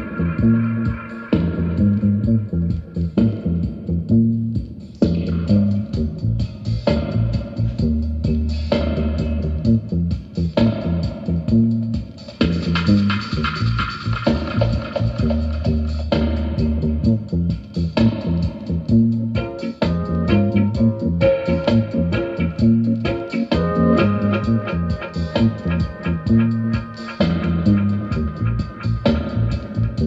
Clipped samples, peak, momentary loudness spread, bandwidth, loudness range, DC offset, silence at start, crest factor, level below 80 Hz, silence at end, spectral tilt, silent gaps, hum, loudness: under 0.1%; -4 dBFS; 7 LU; 7.8 kHz; 2 LU; under 0.1%; 0 s; 16 dB; -30 dBFS; 0 s; -9 dB/octave; none; none; -20 LUFS